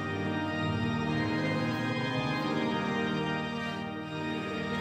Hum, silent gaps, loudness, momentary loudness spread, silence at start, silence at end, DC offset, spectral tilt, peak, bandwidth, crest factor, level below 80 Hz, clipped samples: none; none; -32 LUFS; 5 LU; 0 s; 0 s; under 0.1%; -6.5 dB/octave; -18 dBFS; 13.5 kHz; 12 dB; -60 dBFS; under 0.1%